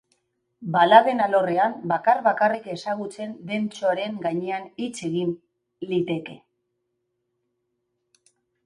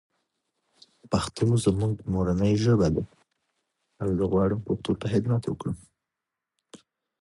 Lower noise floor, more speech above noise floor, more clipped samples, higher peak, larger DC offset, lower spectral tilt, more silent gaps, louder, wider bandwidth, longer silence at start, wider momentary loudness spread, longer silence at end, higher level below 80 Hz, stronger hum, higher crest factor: second, -77 dBFS vs -87 dBFS; second, 54 dB vs 62 dB; neither; first, 0 dBFS vs -10 dBFS; neither; second, -5.5 dB/octave vs -7.5 dB/octave; neither; first, -23 LUFS vs -26 LUFS; about the same, 11.5 kHz vs 11.5 kHz; second, 0.6 s vs 1.1 s; first, 17 LU vs 11 LU; first, 2.3 s vs 0.45 s; second, -74 dBFS vs -46 dBFS; neither; first, 24 dB vs 18 dB